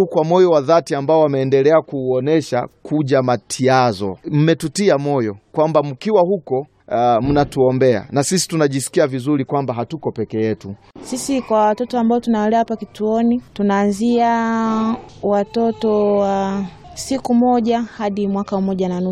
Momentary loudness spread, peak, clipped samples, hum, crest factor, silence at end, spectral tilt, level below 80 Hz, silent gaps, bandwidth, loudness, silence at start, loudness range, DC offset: 9 LU; 0 dBFS; under 0.1%; none; 16 dB; 0 s; -6 dB/octave; -48 dBFS; none; 14.5 kHz; -17 LUFS; 0 s; 3 LU; under 0.1%